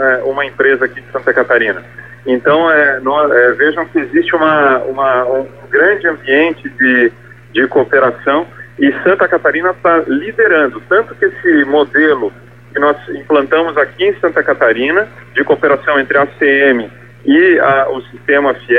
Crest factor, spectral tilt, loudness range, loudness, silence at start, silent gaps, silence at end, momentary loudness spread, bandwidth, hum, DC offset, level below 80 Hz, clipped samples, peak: 12 dB; -7 dB/octave; 1 LU; -12 LUFS; 0 s; none; 0 s; 7 LU; 4.7 kHz; 60 Hz at -40 dBFS; 0.4%; -52 dBFS; under 0.1%; 0 dBFS